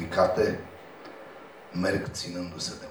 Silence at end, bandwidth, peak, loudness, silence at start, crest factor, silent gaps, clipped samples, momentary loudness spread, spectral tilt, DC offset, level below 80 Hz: 0 s; over 20 kHz; -10 dBFS; -29 LUFS; 0 s; 20 dB; none; under 0.1%; 21 LU; -4.5 dB/octave; under 0.1%; -56 dBFS